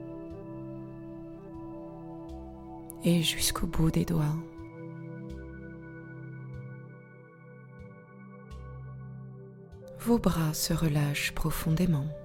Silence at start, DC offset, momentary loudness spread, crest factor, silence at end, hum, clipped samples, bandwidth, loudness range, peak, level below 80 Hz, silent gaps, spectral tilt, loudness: 0 s; under 0.1%; 22 LU; 24 dB; 0 s; none; under 0.1%; 17 kHz; 16 LU; -10 dBFS; -46 dBFS; none; -5 dB/octave; -30 LUFS